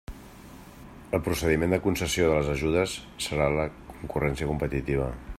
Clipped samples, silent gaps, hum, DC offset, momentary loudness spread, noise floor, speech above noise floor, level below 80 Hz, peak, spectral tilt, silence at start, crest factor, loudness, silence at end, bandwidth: under 0.1%; none; none; under 0.1%; 23 LU; -47 dBFS; 20 dB; -42 dBFS; -10 dBFS; -5.5 dB/octave; 0.1 s; 18 dB; -27 LUFS; 0 s; 16 kHz